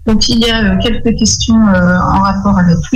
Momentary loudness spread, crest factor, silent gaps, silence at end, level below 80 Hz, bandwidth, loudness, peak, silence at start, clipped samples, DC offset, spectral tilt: 3 LU; 8 dB; none; 0 s; -22 dBFS; 11 kHz; -10 LUFS; -2 dBFS; 0 s; under 0.1%; under 0.1%; -4.5 dB/octave